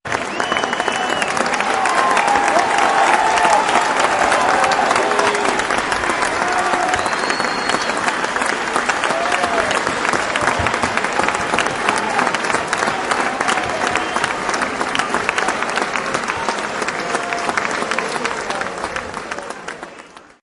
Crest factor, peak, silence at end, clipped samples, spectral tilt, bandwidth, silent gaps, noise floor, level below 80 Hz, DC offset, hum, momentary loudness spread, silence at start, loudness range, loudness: 16 dB; -2 dBFS; 0.2 s; under 0.1%; -2.5 dB/octave; 11.5 kHz; none; -40 dBFS; -48 dBFS; under 0.1%; none; 7 LU; 0.05 s; 6 LU; -17 LUFS